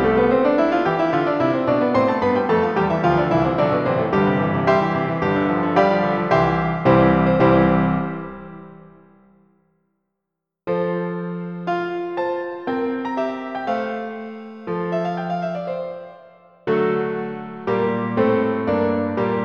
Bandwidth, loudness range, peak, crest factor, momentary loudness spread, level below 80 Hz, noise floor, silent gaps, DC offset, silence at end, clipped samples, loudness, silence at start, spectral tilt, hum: 7 kHz; 9 LU; -2 dBFS; 18 dB; 12 LU; -46 dBFS; -81 dBFS; none; 0.1%; 0 s; under 0.1%; -20 LUFS; 0 s; -8.5 dB/octave; none